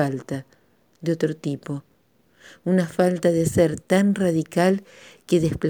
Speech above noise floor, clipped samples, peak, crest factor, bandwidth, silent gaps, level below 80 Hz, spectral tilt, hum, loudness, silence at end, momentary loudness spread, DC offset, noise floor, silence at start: 40 dB; under 0.1%; -4 dBFS; 18 dB; 19.5 kHz; none; -52 dBFS; -6.5 dB/octave; none; -22 LUFS; 0 s; 13 LU; under 0.1%; -62 dBFS; 0 s